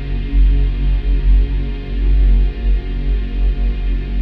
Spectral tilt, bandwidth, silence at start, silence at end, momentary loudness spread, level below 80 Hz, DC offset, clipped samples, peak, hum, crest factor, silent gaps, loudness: -9.5 dB/octave; 4.5 kHz; 0 s; 0 s; 6 LU; -14 dBFS; under 0.1%; under 0.1%; -4 dBFS; none; 10 dB; none; -19 LUFS